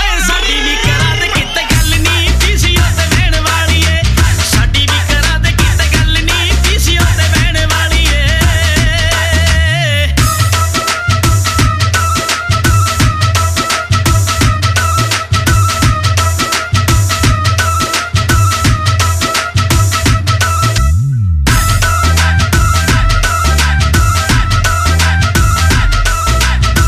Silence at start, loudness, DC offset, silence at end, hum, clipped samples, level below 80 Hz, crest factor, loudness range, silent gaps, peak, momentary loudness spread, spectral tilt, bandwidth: 0 s; -11 LUFS; under 0.1%; 0 s; none; under 0.1%; -16 dBFS; 10 dB; 1 LU; none; 0 dBFS; 2 LU; -3.5 dB/octave; 15.5 kHz